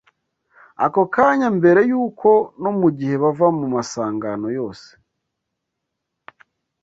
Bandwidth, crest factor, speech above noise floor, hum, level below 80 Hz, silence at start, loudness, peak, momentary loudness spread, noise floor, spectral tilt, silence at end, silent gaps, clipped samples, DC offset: 8 kHz; 18 dB; 61 dB; none; -62 dBFS; 0.8 s; -18 LUFS; -2 dBFS; 10 LU; -79 dBFS; -7 dB/octave; 2.05 s; none; under 0.1%; under 0.1%